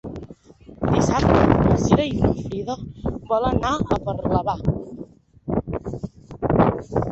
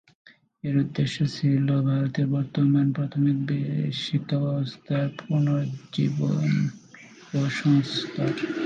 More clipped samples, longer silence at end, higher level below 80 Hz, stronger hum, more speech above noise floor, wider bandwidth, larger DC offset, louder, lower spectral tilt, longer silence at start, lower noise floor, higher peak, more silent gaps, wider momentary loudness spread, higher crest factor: neither; about the same, 0 s vs 0 s; first, -34 dBFS vs -64 dBFS; neither; about the same, 24 dB vs 24 dB; about the same, 8.2 kHz vs 7.8 kHz; neither; first, -21 LUFS vs -25 LUFS; about the same, -7 dB/octave vs -7.5 dB/octave; second, 0.05 s vs 0.65 s; about the same, -45 dBFS vs -48 dBFS; first, -2 dBFS vs -10 dBFS; neither; first, 17 LU vs 6 LU; first, 20 dB vs 14 dB